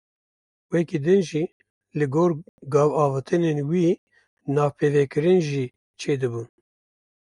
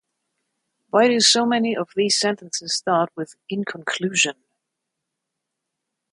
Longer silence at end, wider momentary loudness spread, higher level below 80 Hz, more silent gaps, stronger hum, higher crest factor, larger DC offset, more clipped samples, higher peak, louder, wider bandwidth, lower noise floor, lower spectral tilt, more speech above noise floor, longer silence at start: second, 0.75 s vs 1.8 s; about the same, 13 LU vs 13 LU; first, -66 dBFS vs -74 dBFS; first, 1.52-1.60 s, 1.70-1.81 s, 2.49-2.58 s, 3.98-4.07 s, 4.27-4.37 s, 5.76-5.94 s vs none; neither; about the same, 16 dB vs 20 dB; neither; neither; second, -8 dBFS vs -4 dBFS; second, -23 LUFS vs -20 LUFS; about the same, 11 kHz vs 11 kHz; first, under -90 dBFS vs -81 dBFS; first, -7.5 dB/octave vs -2.5 dB/octave; first, over 68 dB vs 60 dB; second, 0.7 s vs 0.95 s